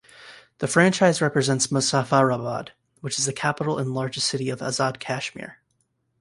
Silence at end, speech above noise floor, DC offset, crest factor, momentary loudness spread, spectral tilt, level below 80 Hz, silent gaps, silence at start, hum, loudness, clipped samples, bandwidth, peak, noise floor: 0.7 s; 48 dB; under 0.1%; 20 dB; 13 LU; -4 dB/octave; -62 dBFS; none; 0.2 s; none; -23 LUFS; under 0.1%; 11.5 kHz; -4 dBFS; -71 dBFS